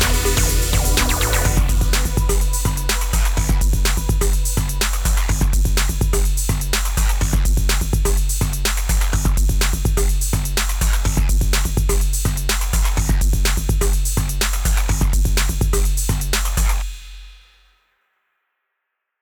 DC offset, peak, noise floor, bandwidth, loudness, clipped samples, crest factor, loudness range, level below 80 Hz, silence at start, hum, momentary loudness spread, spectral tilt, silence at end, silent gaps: under 0.1%; -2 dBFS; -77 dBFS; over 20 kHz; -19 LUFS; under 0.1%; 14 dB; 2 LU; -18 dBFS; 0 s; none; 3 LU; -3.5 dB/octave; 1.85 s; none